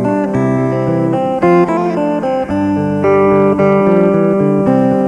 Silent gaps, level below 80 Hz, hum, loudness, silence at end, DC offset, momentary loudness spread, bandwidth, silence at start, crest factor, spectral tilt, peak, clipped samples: none; -44 dBFS; none; -12 LUFS; 0 s; under 0.1%; 5 LU; 9.8 kHz; 0 s; 12 dB; -9 dB/octave; 0 dBFS; under 0.1%